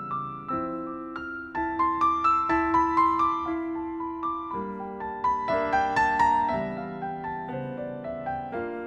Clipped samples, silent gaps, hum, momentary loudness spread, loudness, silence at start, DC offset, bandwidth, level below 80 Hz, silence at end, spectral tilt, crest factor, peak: under 0.1%; none; none; 12 LU; -27 LUFS; 0 s; under 0.1%; 9 kHz; -52 dBFS; 0 s; -6.5 dB/octave; 16 dB; -12 dBFS